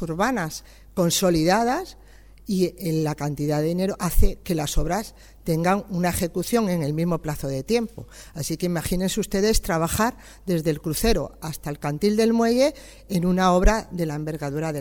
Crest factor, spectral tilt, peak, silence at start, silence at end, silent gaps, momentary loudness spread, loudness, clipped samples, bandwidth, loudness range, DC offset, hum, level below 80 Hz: 20 dB; -5 dB/octave; -4 dBFS; 0 s; 0 s; none; 12 LU; -24 LUFS; under 0.1%; 19.5 kHz; 3 LU; under 0.1%; none; -32 dBFS